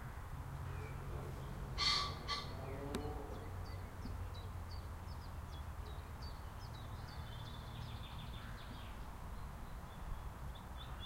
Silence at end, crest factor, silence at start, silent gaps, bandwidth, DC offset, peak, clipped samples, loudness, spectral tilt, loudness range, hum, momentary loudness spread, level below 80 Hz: 0 s; 24 dB; 0 s; none; 16 kHz; under 0.1%; -22 dBFS; under 0.1%; -46 LUFS; -4.5 dB/octave; 8 LU; none; 9 LU; -50 dBFS